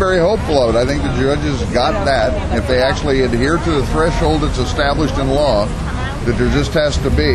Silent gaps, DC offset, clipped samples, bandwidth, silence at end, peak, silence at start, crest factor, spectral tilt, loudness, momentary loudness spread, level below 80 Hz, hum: none; under 0.1%; under 0.1%; 12.5 kHz; 0 s; 0 dBFS; 0 s; 14 dB; -6 dB/octave; -16 LUFS; 4 LU; -22 dBFS; none